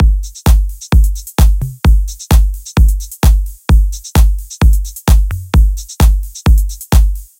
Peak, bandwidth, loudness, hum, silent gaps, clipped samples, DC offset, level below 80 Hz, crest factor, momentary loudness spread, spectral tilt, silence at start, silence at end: 0 dBFS; 17 kHz; -14 LUFS; none; none; 0.1%; under 0.1%; -10 dBFS; 10 dB; 3 LU; -5.5 dB/octave; 0 s; 0.15 s